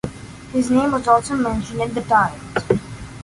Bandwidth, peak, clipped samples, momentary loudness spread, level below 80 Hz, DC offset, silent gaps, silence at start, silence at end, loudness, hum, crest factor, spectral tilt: 11.5 kHz; -2 dBFS; under 0.1%; 11 LU; -42 dBFS; under 0.1%; none; 0.05 s; 0 s; -19 LUFS; none; 18 dB; -6 dB/octave